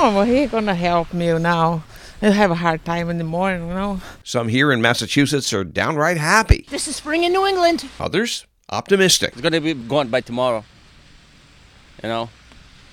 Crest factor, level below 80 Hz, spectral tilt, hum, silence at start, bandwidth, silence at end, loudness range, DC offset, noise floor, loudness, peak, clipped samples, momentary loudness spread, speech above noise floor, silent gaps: 20 dB; -34 dBFS; -4.5 dB/octave; none; 0 s; 17.5 kHz; 0.6 s; 3 LU; under 0.1%; -48 dBFS; -19 LUFS; 0 dBFS; under 0.1%; 10 LU; 30 dB; none